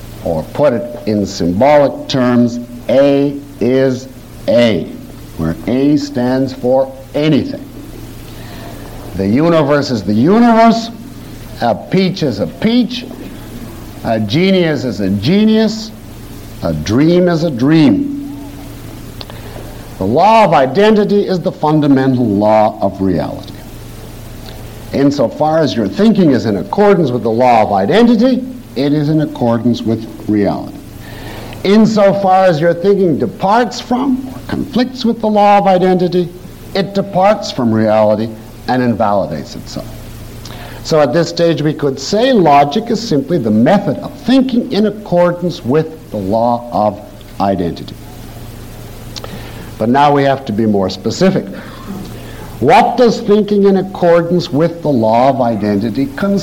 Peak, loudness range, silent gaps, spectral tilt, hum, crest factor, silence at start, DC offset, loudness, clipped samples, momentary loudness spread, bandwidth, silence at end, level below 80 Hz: -2 dBFS; 5 LU; none; -7 dB/octave; none; 12 dB; 0 s; under 0.1%; -12 LUFS; under 0.1%; 20 LU; 17 kHz; 0 s; -38 dBFS